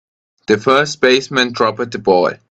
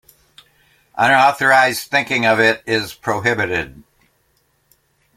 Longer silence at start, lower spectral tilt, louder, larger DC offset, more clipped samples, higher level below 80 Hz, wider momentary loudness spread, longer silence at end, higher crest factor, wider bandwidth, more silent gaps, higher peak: second, 0.5 s vs 0.95 s; about the same, -4 dB/octave vs -4 dB/octave; about the same, -14 LUFS vs -15 LUFS; neither; neither; about the same, -56 dBFS vs -54 dBFS; second, 5 LU vs 10 LU; second, 0.15 s vs 1.45 s; about the same, 16 dB vs 18 dB; second, 9 kHz vs 16.5 kHz; neither; about the same, 0 dBFS vs 0 dBFS